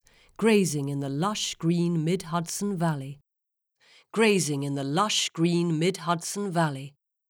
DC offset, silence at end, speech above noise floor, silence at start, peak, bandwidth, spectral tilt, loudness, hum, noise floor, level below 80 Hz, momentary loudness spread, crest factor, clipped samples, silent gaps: under 0.1%; 0.4 s; 58 dB; 0.4 s; -10 dBFS; 18.5 kHz; -4.5 dB/octave; -26 LUFS; none; -84 dBFS; -66 dBFS; 8 LU; 18 dB; under 0.1%; none